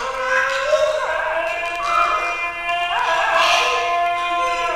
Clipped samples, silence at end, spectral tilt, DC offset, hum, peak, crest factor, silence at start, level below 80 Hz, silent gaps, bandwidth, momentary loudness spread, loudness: under 0.1%; 0 s; -0.5 dB/octave; 0.2%; none; -4 dBFS; 16 dB; 0 s; -48 dBFS; none; 15.5 kHz; 6 LU; -18 LUFS